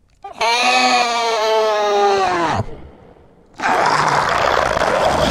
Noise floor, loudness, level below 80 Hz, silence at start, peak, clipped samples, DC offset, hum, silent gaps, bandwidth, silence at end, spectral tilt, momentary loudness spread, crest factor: -46 dBFS; -16 LUFS; -40 dBFS; 0.25 s; 0 dBFS; under 0.1%; under 0.1%; none; none; 16.5 kHz; 0 s; -3 dB/octave; 7 LU; 16 dB